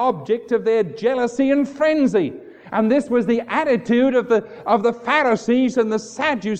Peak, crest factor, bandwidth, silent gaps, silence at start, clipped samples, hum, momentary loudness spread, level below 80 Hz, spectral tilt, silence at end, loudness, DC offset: -2 dBFS; 16 dB; 9 kHz; none; 0 s; under 0.1%; none; 5 LU; -60 dBFS; -6 dB/octave; 0 s; -19 LUFS; under 0.1%